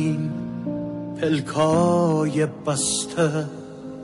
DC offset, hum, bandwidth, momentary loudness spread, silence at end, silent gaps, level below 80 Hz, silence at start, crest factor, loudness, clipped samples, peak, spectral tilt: under 0.1%; none; 11.5 kHz; 11 LU; 0 s; none; -56 dBFS; 0 s; 14 dB; -23 LUFS; under 0.1%; -8 dBFS; -5 dB/octave